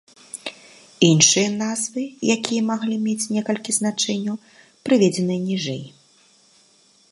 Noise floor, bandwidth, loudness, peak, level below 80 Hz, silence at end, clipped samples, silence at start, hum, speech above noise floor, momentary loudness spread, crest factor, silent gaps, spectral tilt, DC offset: -57 dBFS; 11.5 kHz; -20 LUFS; -2 dBFS; -68 dBFS; 1.25 s; under 0.1%; 0.35 s; none; 36 dB; 19 LU; 20 dB; none; -3.5 dB/octave; under 0.1%